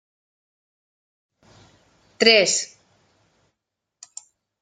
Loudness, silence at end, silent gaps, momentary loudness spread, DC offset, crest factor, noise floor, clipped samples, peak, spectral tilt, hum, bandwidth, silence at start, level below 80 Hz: -17 LUFS; 1.95 s; none; 27 LU; under 0.1%; 26 dB; -82 dBFS; under 0.1%; 0 dBFS; -1 dB/octave; none; 11 kHz; 2.2 s; -70 dBFS